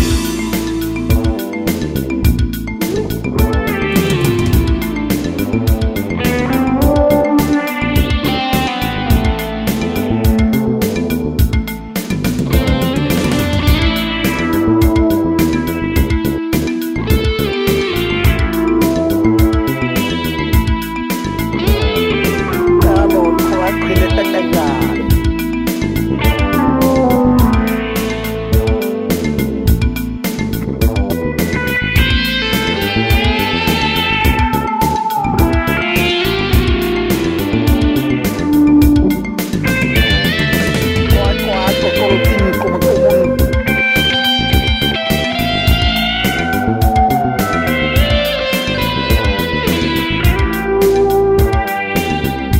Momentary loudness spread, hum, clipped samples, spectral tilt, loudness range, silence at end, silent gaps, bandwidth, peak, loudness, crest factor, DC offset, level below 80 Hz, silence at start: 6 LU; none; under 0.1%; -5.5 dB/octave; 3 LU; 0 s; none; 16.5 kHz; 0 dBFS; -14 LUFS; 14 dB; under 0.1%; -20 dBFS; 0 s